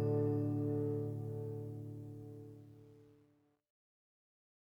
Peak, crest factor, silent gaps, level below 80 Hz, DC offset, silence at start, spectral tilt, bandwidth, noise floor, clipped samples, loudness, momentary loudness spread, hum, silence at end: -24 dBFS; 16 dB; none; -72 dBFS; under 0.1%; 0 s; -11.5 dB/octave; 5.2 kHz; -73 dBFS; under 0.1%; -40 LUFS; 21 LU; none; 1.7 s